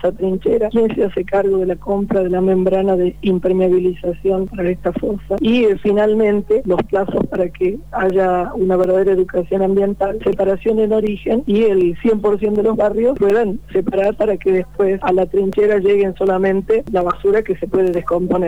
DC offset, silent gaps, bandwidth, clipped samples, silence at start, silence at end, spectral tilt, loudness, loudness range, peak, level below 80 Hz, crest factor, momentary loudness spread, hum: 1%; none; 19.5 kHz; under 0.1%; 0 s; 0 s; -8.5 dB/octave; -16 LUFS; 1 LU; -6 dBFS; -38 dBFS; 10 dB; 5 LU; none